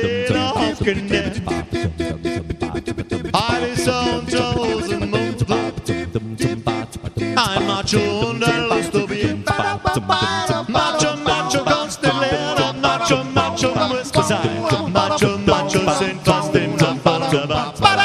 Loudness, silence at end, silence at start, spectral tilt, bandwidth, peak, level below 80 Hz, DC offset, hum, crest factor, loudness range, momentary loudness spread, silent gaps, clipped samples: -19 LUFS; 0 s; 0 s; -4.5 dB/octave; 13.5 kHz; 0 dBFS; -40 dBFS; under 0.1%; none; 18 dB; 4 LU; 7 LU; none; under 0.1%